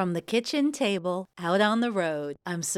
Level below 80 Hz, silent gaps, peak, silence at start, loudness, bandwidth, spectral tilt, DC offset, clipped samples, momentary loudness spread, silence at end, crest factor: -72 dBFS; none; -12 dBFS; 0 s; -27 LUFS; 15.5 kHz; -4 dB/octave; under 0.1%; under 0.1%; 8 LU; 0 s; 16 dB